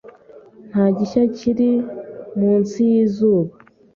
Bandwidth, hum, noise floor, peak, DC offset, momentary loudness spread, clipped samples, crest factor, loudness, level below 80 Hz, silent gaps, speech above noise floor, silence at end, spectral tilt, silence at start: 7.2 kHz; none; -44 dBFS; -4 dBFS; under 0.1%; 12 LU; under 0.1%; 14 dB; -18 LUFS; -58 dBFS; none; 28 dB; 0.45 s; -8.5 dB/octave; 0.05 s